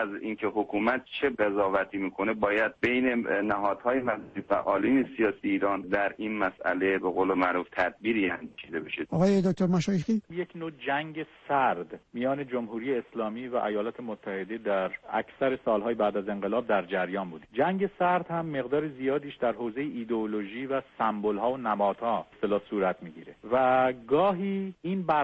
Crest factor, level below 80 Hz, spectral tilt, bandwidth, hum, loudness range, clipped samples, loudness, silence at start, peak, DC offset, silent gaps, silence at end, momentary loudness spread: 16 dB; -62 dBFS; -7 dB/octave; 8.2 kHz; none; 4 LU; under 0.1%; -29 LUFS; 0 s; -12 dBFS; under 0.1%; none; 0 s; 9 LU